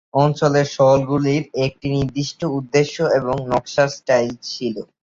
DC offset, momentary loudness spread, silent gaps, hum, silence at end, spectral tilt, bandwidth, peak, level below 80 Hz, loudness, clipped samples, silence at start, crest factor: under 0.1%; 9 LU; none; none; 0.2 s; -6 dB/octave; 7.6 kHz; -2 dBFS; -48 dBFS; -19 LUFS; under 0.1%; 0.15 s; 16 dB